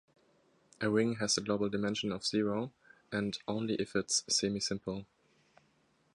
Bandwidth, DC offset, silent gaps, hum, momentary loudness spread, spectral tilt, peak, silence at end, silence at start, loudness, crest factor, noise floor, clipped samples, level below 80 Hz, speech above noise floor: 11.5 kHz; under 0.1%; none; none; 9 LU; -3.5 dB/octave; -16 dBFS; 1.1 s; 0.8 s; -34 LUFS; 18 dB; -72 dBFS; under 0.1%; -66 dBFS; 38 dB